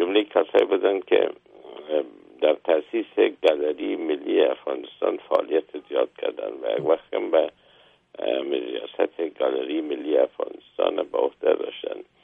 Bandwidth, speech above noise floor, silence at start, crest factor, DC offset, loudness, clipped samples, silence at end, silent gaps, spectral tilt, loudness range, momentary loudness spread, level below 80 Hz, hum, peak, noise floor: 5 kHz; 33 dB; 0 s; 18 dB; under 0.1%; -24 LUFS; under 0.1%; 0.2 s; none; -6 dB/octave; 3 LU; 10 LU; -72 dBFS; none; -6 dBFS; -57 dBFS